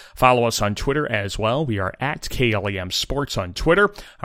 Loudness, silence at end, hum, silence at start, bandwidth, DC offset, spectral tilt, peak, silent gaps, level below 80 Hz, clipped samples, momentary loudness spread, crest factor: -21 LUFS; 0 s; none; 0 s; 16.5 kHz; under 0.1%; -4.5 dB/octave; 0 dBFS; none; -36 dBFS; under 0.1%; 7 LU; 20 dB